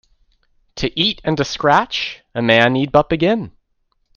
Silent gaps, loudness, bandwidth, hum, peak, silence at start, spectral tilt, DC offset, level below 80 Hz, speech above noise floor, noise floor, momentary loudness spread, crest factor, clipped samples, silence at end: none; -17 LUFS; 7.2 kHz; none; 0 dBFS; 0.75 s; -5 dB/octave; under 0.1%; -44 dBFS; 50 dB; -66 dBFS; 11 LU; 18 dB; under 0.1%; 0.7 s